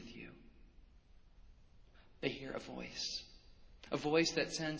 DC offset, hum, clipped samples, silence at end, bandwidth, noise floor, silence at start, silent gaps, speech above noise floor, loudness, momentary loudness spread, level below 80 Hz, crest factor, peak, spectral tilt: under 0.1%; none; under 0.1%; 0 s; 8 kHz; -62 dBFS; 0 s; none; 24 dB; -38 LUFS; 21 LU; -64 dBFS; 24 dB; -18 dBFS; -3.5 dB/octave